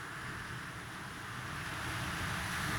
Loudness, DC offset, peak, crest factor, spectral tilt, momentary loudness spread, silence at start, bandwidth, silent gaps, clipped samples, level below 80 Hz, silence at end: -40 LUFS; under 0.1%; -24 dBFS; 16 dB; -3.5 dB/octave; 7 LU; 0 s; over 20 kHz; none; under 0.1%; -56 dBFS; 0 s